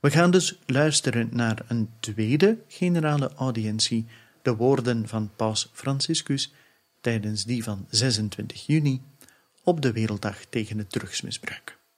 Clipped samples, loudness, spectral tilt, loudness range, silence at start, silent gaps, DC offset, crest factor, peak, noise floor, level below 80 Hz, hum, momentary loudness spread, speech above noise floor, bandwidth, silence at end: under 0.1%; -25 LUFS; -5 dB/octave; 3 LU; 0.05 s; none; under 0.1%; 20 dB; -4 dBFS; -57 dBFS; -64 dBFS; none; 10 LU; 32 dB; 15 kHz; 0.25 s